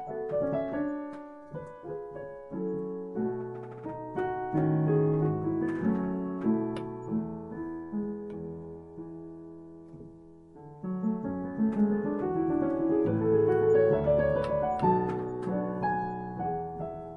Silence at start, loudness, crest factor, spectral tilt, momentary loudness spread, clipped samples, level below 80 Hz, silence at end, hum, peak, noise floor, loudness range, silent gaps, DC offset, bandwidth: 0 s; -30 LUFS; 18 dB; -10.5 dB/octave; 18 LU; under 0.1%; -56 dBFS; 0 s; none; -12 dBFS; -51 dBFS; 12 LU; none; under 0.1%; 5.4 kHz